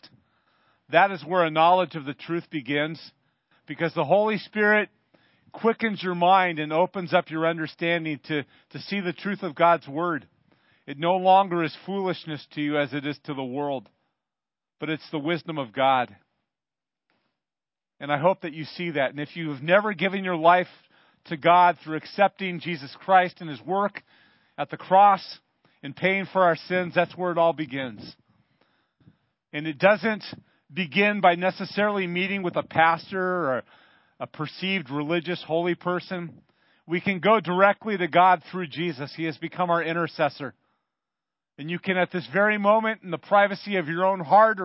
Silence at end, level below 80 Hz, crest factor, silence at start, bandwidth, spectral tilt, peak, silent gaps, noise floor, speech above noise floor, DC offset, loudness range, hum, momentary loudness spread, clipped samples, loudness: 0 s; -74 dBFS; 22 dB; 0.9 s; 5.8 kHz; -10 dB/octave; -2 dBFS; none; under -90 dBFS; over 66 dB; under 0.1%; 6 LU; none; 14 LU; under 0.1%; -24 LUFS